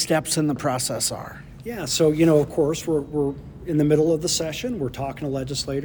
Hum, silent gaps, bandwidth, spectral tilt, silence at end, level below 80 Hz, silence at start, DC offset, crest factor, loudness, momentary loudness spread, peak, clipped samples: none; none; over 20 kHz; -4.5 dB/octave; 0 s; -46 dBFS; 0 s; under 0.1%; 16 dB; -22 LUFS; 12 LU; -6 dBFS; under 0.1%